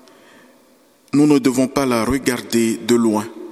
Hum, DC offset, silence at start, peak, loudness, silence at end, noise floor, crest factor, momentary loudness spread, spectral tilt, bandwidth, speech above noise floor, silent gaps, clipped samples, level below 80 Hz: none; under 0.1%; 1.15 s; 0 dBFS; -17 LUFS; 0 s; -53 dBFS; 18 dB; 6 LU; -5 dB/octave; 15 kHz; 37 dB; none; under 0.1%; -46 dBFS